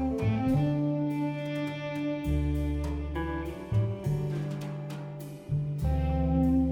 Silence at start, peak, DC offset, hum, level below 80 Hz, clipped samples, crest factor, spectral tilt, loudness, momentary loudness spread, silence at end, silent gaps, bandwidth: 0 s; -16 dBFS; under 0.1%; none; -36 dBFS; under 0.1%; 14 dB; -8.5 dB/octave; -31 LUFS; 9 LU; 0 s; none; 16 kHz